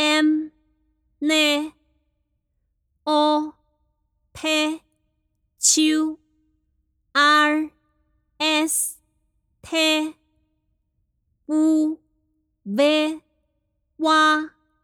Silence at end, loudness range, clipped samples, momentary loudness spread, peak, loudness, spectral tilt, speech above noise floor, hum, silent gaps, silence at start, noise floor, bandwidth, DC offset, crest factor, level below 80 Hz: 0.35 s; 4 LU; under 0.1%; 17 LU; -4 dBFS; -20 LUFS; -1 dB/octave; 53 dB; none; none; 0 s; -73 dBFS; 17.5 kHz; under 0.1%; 18 dB; -66 dBFS